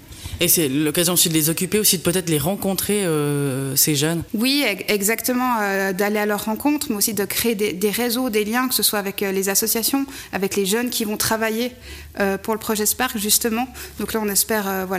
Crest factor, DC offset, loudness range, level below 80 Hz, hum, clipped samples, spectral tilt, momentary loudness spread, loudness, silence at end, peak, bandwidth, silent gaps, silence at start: 16 dB; under 0.1%; 3 LU; -48 dBFS; none; under 0.1%; -3 dB/octave; 7 LU; -19 LUFS; 0 s; -4 dBFS; 16 kHz; none; 0 s